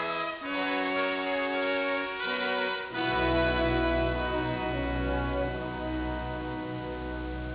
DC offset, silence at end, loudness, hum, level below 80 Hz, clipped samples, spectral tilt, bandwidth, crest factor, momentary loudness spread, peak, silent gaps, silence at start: under 0.1%; 0 s; -30 LUFS; none; -40 dBFS; under 0.1%; -3.5 dB/octave; 4 kHz; 16 dB; 9 LU; -14 dBFS; none; 0 s